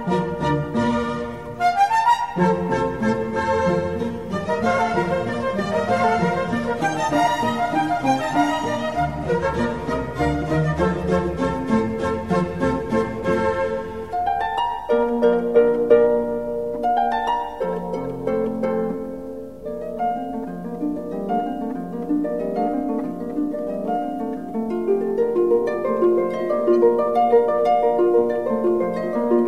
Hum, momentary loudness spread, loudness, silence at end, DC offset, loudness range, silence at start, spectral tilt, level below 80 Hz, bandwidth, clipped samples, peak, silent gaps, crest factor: none; 9 LU; -21 LUFS; 0 s; 0.5%; 7 LU; 0 s; -7 dB/octave; -44 dBFS; 13 kHz; under 0.1%; -4 dBFS; none; 18 dB